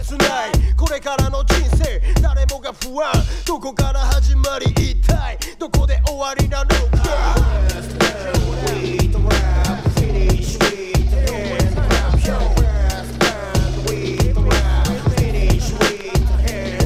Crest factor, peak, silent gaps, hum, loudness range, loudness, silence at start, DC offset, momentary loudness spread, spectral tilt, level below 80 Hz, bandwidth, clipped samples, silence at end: 16 dB; 0 dBFS; none; none; 1 LU; -18 LUFS; 0 s; under 0.1%; 4 LU; -5 dB/octave; -18 dBFS; 15.5 kHz; under 0.1%; 0 s